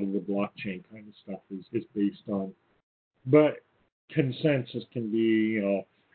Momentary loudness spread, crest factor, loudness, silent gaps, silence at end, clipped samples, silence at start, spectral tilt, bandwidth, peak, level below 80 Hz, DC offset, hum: 19 LU; 22 dB; -28 LUFS; 2.83-3.11 s, 3.92-4.08 s; 0.3 s; under 0.1%; 0 s; -11.5 dB/octave; 4.5 kHz; -8 dBFS; -70 dBFS; under 0.1%; none